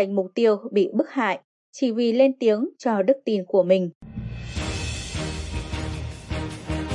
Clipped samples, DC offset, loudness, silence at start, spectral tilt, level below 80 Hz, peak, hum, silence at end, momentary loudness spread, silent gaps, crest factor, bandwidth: under 0.1%; under 0.1%; -24 LUFS; 0 s; -6 dB/octave; -40 dBFS; -6 dBFS; none; 0 s; 13 LU; 1.44-1.73 s, 3.95-4.01 s; 18 dB; 11.5 kHz